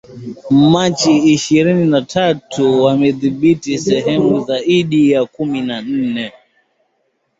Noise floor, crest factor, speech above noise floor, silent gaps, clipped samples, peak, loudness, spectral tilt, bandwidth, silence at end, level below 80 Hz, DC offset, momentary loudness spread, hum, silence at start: -65 dBFS; 12 dB; 52 dB; none; under 0.1%; -2 dBFS; -14 LUFS; -5.5 dB/octave; 8 kHz; 1.1 s; -52 dBFS; under 0.1%; 8 LU; none; 0.1 s